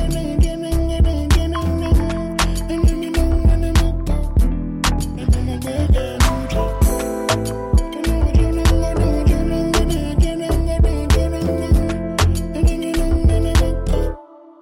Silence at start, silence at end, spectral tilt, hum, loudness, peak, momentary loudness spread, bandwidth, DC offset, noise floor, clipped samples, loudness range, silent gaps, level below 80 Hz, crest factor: 0 s; 0.35 s; -6 dB/octave; none; -19 LUFS; -6 dBFS; 4 LU; 16 kHz; under 0.1%; -36 dBFS; under 0.1%; 1 LU; none; -18 dBFS; 10 dB